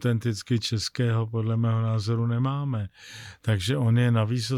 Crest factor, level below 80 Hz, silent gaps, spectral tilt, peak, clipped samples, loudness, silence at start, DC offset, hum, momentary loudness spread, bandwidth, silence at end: 10 dB; -58 dBFS; none; -6.5 dB/octave; -14 dBFS; under 0.1%; -26 LUFS; 0 s; under 0.1%; none; 10 LU; 12.5 kHz; 0 s